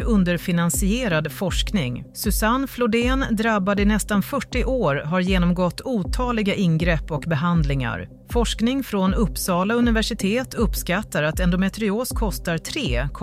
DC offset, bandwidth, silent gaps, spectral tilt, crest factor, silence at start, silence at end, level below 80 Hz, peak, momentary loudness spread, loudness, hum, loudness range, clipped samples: under 0.1%; 16 kHz; none; -5.5 dB/octave; 14 dB; 0 s; 0 s; -30 dBFS; -8 dBFS; 5 LU; -22 LUFS; none; 1 LU; under 0.1%